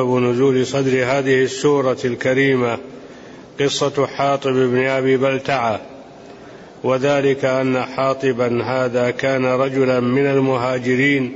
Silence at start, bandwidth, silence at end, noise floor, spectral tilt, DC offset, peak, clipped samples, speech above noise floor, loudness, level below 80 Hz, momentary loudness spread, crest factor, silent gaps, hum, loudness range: 0 s; 8 kHz; 0 s; -39 dBFS; -5.5 dB/octave; under 0.1%; -4 dBFS; under 0.1%; 22 dB; -18 LUFS; -56 dBFS; 6 LU; 12 dB; none; none; 2 LU